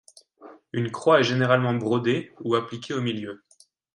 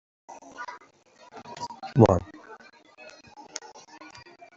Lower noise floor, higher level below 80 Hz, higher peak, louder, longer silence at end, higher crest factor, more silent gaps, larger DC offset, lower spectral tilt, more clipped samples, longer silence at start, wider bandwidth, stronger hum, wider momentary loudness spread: second, -50 dBFS vs -56 dBFS; second, -68 dBFS vs -54 dBFS; about the same, -4 dBFS vs -4 dBFS; about the same, -24 LUFS vs -24 LUFS; second, 0.6 s vs 1 s; about the same, 22 dB vs 26 dB; neither; neither; about the same, -6 dB/octave vs -7 dB/octave; neither; about the same, 0.4 s vs 0.3 s; first, 11.5 kHz vs 7.8 kHz; neither; second, 14 LU vs 28 LU